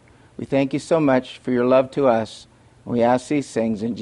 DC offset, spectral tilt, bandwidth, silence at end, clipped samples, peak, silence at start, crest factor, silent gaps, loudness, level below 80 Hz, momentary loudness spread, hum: under 0.1%; -6.5 dB/octave; 11.5 kHz; 0 s; under 0.1%; -4 dBFS; 0.4 s; 16 dB; none; -20 LUFS; -58 dBFS; 7 LU; none